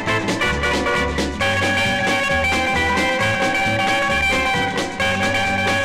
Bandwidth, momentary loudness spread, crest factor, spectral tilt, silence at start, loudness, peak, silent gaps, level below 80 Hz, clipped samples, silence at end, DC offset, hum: 16 kHz; 3 LU; 10 dB; -4 dB/octave; 0 s; -18 LUFS; -10 dBFS; none; -36 dBFS; under 0.1%; 0 s; under 0.1%; none